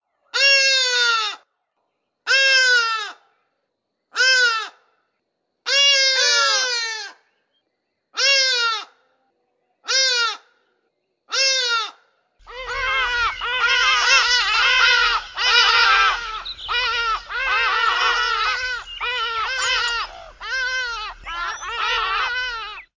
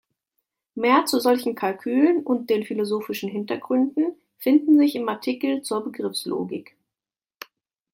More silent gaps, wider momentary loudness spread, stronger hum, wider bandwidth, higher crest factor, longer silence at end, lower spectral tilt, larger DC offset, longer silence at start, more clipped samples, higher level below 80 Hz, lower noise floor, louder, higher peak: neither; about the same, 15 LU vs 13 LU; neither; second, 7.6 kHz vs 16.5 kHz; about the same, 20 dB vs 18 dB; second, 0.15 s vs 1.3 s; second, 2.5 dB/octave vs -4.5 dB/octave; neither; second, 0.35 s vs 0.75 s; neither; first, -50 dBFS vs -74 dBFS; second, -76 dBFS vs under -90 dBFS; first, -17 LUFS vs -23 LUFS; first, -2 dBFS vs -6 dBFS